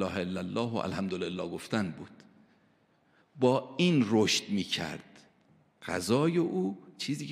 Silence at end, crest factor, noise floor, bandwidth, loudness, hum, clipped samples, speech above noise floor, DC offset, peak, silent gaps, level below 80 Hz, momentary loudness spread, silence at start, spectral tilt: 0 s; 20 dB; -68 dBFS; 15 kHz; -30 LUFS; none; under 0.1%; 38 dB; under 0.1%; -12 dBFS; none; -68 dBFS; 12 LU; 0 s; -5 dB/octave